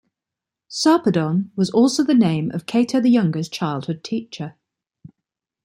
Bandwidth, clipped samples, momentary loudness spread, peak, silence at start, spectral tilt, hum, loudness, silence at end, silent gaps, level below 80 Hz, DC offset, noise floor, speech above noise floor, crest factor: 14.5 kHz; under 0.1%; 11 LU; -4 dBFS; 0.7 s; -6 dB/octave; none; -19 LUFS; 1.15 s; none; -64 dBFS; under 0.1%; -86 dBFS; 68 dB; 16 dB